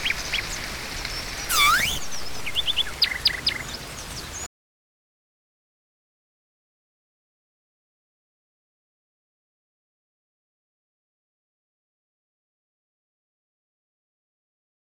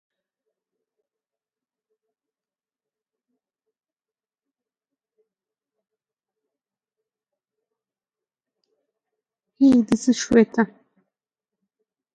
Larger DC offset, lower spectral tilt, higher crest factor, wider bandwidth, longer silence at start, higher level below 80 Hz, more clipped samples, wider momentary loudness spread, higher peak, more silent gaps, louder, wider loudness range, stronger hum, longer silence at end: neither; second, -0.5 dB/octave vs -5 dB/octave; about the same, 22 dB vs 24 dB; first, 19 kHz vs 9 kHz; second, 0 s vs 9.6 s; first, -46 dBFS vs -60 dBFS; neither; first, 16 LU vs 7 LU; second, -8 dBFS vs -4 dBFS; neither; second, -24 LUFS vs -19 LUFS; first, 17 LU vs 3 LU; neither; first, 10.55 s vs 1.5 s